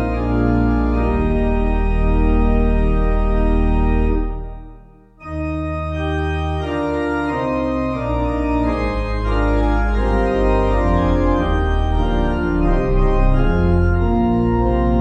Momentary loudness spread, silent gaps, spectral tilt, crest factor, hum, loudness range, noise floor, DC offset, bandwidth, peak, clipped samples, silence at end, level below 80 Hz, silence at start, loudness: 5 LU; none; -9 dB/octave; 14 dB; none; 4 LU; -43 dBFS; under 0.1%; 6.6 kHz; -2 dBFS; under 0.1%; 0 s; -20 dBFS; 0 s; -19 LUFS